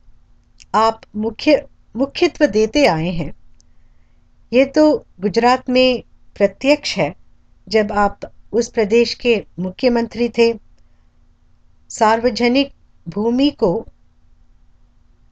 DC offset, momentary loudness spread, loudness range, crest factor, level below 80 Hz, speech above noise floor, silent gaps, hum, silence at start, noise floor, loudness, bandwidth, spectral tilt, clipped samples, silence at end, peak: under 0.1%; 10 LU; 3 LU; 18 dB; -42 dBFS; 35 dB; none; none; 0.75 s; -51 dBFS; -17 LUFS; 8.8 kHz; -5 dB/octave; under 0.1%; 1.5 s; 0 dBFS